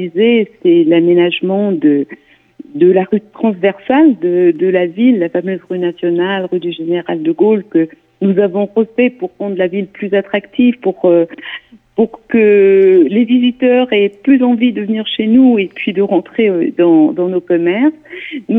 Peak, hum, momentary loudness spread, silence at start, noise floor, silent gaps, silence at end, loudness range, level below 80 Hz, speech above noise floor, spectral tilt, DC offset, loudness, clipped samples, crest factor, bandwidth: 0 dBFS; none; 9 LU; 0 s; -37 dBFS; none; 0 s; 4 LU; -60 dBFS; 25 dB; -9.5 dB/octave; under 0.1%; -12 LUFS; under 0.1%; 12 dB; 3.9 kHz